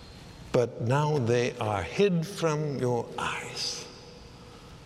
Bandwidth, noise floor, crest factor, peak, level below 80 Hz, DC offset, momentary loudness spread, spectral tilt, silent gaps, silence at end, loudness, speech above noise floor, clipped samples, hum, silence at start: 14.5 kHz; -48 dBFS; 20 dB; -10 dBFS; -56 dBFS; under 0.1%; 22 LU; -5.5 dB/octave; none; 0 s; -28 LUFS; 20 dB; under 0.1%; none; 0 s